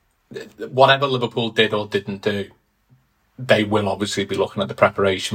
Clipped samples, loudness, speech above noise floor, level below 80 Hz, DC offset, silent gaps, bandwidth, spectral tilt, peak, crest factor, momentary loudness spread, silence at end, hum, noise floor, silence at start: under 0.1%; -19 LUFS; 39 dB; -60 dBFS; under 0.1%; none; 16 kHz; -5 dB/octave; 0 dBFS; 20 dB; 20 LU; 0 s; none; -59 dBFS; 0.3 s